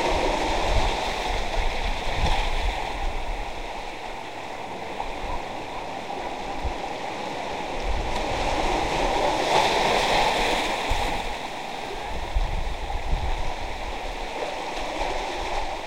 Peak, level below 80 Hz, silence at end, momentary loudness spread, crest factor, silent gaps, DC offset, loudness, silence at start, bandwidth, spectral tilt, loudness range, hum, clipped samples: -6 dBFS; -30 dBFS; 0 s; 12 LU; 20 dB; none; 0.9%; -27 LUFS; 0 s; 16 kHz; -3.5 dB/octave; 9 LU; none; under 0.1%